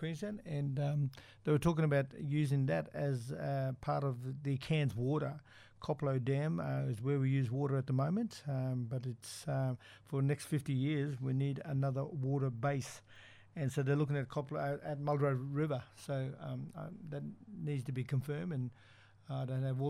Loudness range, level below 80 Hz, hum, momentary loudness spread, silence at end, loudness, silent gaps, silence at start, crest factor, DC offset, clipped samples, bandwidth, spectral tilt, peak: 4 LU; -66 dBFS; none; 11 LU; 0 s; -37 LUFS; none; 0 s; 18 dB; under 0.1%; under 0.1%; 12.5 kHz; -7.5 dB/octave; -18 dBFS